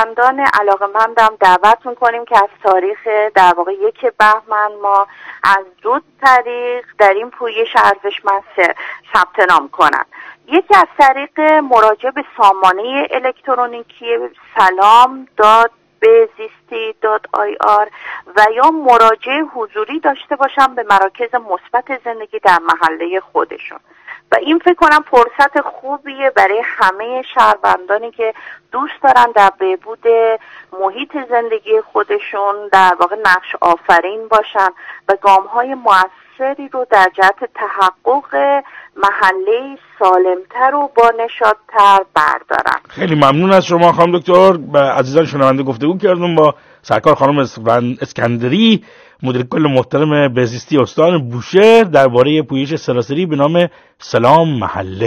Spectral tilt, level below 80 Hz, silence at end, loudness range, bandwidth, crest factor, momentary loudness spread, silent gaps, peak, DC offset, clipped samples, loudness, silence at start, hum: -5.5 dB/octave; -54 dBFS; 0 s; 3 LU; 16.5 kHz; 12 dB; 11 LU; none; 0 dBFS; under 0.1%; 1%; -12 LUFS; 0 s; none